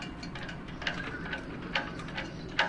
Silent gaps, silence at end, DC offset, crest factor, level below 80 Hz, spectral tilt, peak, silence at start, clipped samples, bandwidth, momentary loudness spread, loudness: none; 0 s; under 0.1%; 26 dB; -50 dBFS; -4.5 dB/octave; -10 dBFS; 0 s; under 0.1%; 11 kHz; 6 LU; -37 LUFS